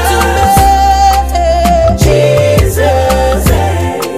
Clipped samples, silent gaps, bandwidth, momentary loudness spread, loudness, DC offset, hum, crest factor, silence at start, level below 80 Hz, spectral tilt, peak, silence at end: under 0.1%; none; 16 kHz; 4 LU; -9 LUFS; 0.9%; none; 8 dB; 0 s; -16 dBFS; -5 dB/octave; 0 dBFS; 0 s